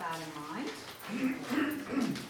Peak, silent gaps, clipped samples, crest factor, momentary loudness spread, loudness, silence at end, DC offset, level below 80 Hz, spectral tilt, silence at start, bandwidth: -20 dBFS; none; under 0.1%; 16 dB; 8 LU; -36 LUFS; 0 s; under 0.1%; -70 dBFS; -4.5 dB/octave; 0 s; over 20 kHz